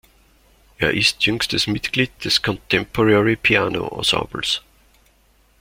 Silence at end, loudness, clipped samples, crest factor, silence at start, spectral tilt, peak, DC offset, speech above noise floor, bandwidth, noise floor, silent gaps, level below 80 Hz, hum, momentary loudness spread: 1 s; -18 LUFS; under 0.1%; 20 dB; 0.8 s; -4 dB/octave; 0 dBFS; under 0.1%; 38 dB; 16.5 kHz; -57 dBFS; none; -46 dBFS; none; 6 LU